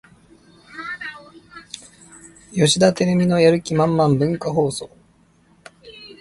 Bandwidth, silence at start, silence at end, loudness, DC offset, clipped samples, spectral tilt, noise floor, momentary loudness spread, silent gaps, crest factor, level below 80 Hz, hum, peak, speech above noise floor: 11.5 kHz; 0.75 s; 0.1 s; -18 LUFS; under 0.1%; under 0.1%; -5.5 dB/octave; -56 dBFS; 22 LU; none; 18 dB; -54 dBFS; none; -2 dBFS; 39 dB